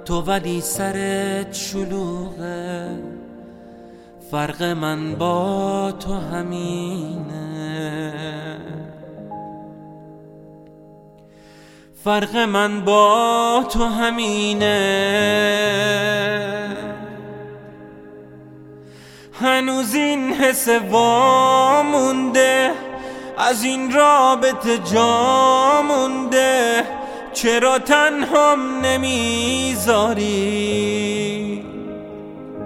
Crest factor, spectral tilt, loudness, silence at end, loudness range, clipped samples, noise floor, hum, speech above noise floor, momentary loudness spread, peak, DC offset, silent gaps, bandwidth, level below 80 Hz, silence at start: 20 dB; -3.5 dB/octave; -18 LUFS; 0 s; 13 LU; under 0.1%; -46 dBFS; none; 28 dB; 18 LU; 0 dBFS; under 0.1%; none; 16.5 kHz; -44 dBFS; 0 s